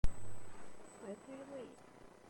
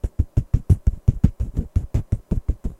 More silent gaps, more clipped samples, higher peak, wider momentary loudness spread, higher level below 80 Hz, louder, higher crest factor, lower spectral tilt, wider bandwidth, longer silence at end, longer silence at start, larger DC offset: neither; neither; second, -18 dBFS vs 0 dBFS; about the same, 8 LU vs 6 LU; second, -46 dBFS vs -24 dBFS; second, -52 LUFS vs -23 LUFS; about the same, 18 dB vs 20 dB; second, -6 dB/octave vs -10 dB/octave; first, 16.5 kHz vs 11.5 kHz; first, 0.2 s vs 0.05 s; about the same, 0.05 s vs 0.05 s; neither